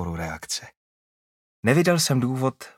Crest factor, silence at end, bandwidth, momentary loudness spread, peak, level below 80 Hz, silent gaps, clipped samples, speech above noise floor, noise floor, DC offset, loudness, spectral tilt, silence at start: 22 dB; 0.1 s; 16.5 kHz; 12 LU; -4 dBFS; -52 dBFS; 0.77-1.63 s; under 0.1%; over 67 dB; under -90 dBFS; under 0.1%; -23 LUFS; -4.5 dB/octave; 0 s